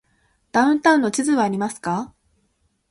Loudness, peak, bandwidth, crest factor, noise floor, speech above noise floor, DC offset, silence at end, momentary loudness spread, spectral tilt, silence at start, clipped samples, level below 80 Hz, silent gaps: -20 LUFS; -4 dBFS; 11.5 kHz; 18 dB; -67 dBFS; 48 dB; under 0.1%; 0.85 s; 10 LU; -4.5 dB/octave; 0.55 s; under 0.1%; -62 dBFS; none